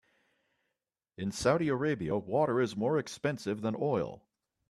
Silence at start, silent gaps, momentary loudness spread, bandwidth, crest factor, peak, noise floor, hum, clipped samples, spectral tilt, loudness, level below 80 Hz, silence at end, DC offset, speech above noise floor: 1.2 s; none; 6 LU; 13 kHz; 20 dB; -14 dBFS; -88 dBFS; none; under 0.1%; -6 dB/octave; -32 LUFS; -64 dBFS; 0.5 s; under 0.1%; 57 dB